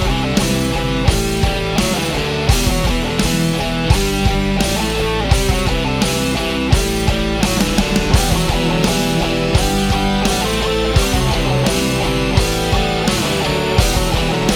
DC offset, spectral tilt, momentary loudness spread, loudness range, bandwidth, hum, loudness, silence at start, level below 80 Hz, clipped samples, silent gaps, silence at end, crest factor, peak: under 0.1%; -4.5 dB/octave; 2 LU; 1 LU; 18 kHz; none; -16 LUFS; 0 s; -22 dBFS; under 0.1%; none; 0 s; 16 dB; 0 dBFS